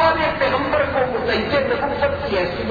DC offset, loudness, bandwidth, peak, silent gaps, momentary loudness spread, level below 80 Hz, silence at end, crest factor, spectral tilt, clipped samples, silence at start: under 0.1%; -19 LUFS; 7 kHz; -4 dBFS; none; 3 LU; -38 dBFS; 0 s; 16 dB; -7 dB/octave; under 0.1%; 0 s